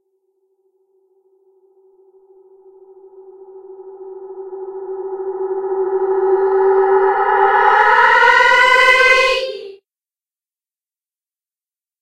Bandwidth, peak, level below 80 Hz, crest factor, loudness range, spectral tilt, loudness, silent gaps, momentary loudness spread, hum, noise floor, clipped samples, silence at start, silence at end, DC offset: 12.5 kHz; 0 dBFS; -54 dBFS; 18 dB; 18 LU; -1.5 dB/octave; -12 LUFS; none; 22 LU; none; under -90 dBFS; under 0.1%; 3.2 s; 2.25 s; under 0.1%